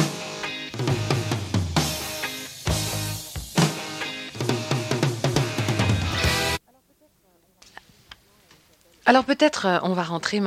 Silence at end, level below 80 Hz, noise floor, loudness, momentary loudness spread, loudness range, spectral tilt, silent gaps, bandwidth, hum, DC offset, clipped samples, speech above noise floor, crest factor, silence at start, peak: 0 s; -42 dBFS; -62 dBFS; -24 LUFS; 10 LU; 2 LU; -4.5 dB/octave; none; 16.5 kHz; none; under 0.1%; under 0.1%; 41 dB; 22 dB; 0 s; -2 dBFS